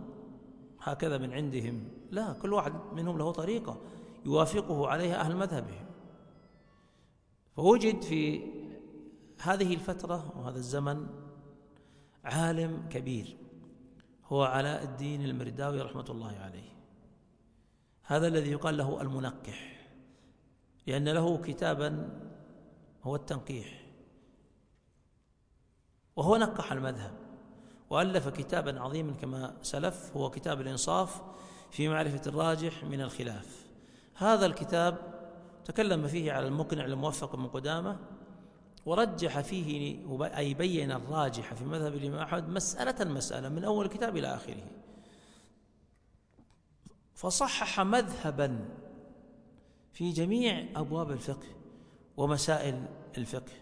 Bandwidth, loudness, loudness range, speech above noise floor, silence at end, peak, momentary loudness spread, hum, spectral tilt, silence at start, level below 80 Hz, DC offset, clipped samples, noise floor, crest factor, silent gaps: 10.5 kHz; -33 LUFS; 5 LU; 37 dB; 0 s; -10 dBFS; 19 LU; none; -5 dB/octave; 0 s; -60 dBFS; under 0.1%; under 0.1%; -69 dBFS; 24 dB; none